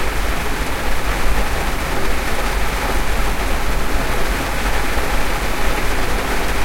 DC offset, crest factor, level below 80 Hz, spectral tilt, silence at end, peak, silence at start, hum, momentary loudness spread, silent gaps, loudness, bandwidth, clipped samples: under 0.1%; 12 dB; -22 dBFS; -4 dB/octave; 0 s; -2 dBFS; 0 s; none; 1 LU; none; -21 LUFS; 16.5 kHz; under 0.1%